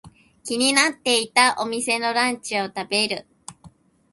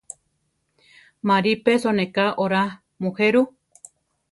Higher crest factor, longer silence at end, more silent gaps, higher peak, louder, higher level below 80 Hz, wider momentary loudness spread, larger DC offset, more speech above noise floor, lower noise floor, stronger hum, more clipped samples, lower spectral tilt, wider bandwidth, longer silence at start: about the same, 22 dB vs 20 dB; second, 0.45 s vs 0.8 s; neither; first, 0 dBFS vs -4 dBFS; about the same, -20 LUFS vs -21 LUFS; about the same, -64 dBFS vs -66 dBFS; about the same, 9 LU vs 11 LU; neither; second, 29 dB vs 51 dB; second, -51 dBFS vs -72 dBFS; neither; neither; second, -1 dB/octave vs -5.5 dB/octave; about the same, 12 kHz vs 11.5 kHz; second, 0.05 s vs 1.25 s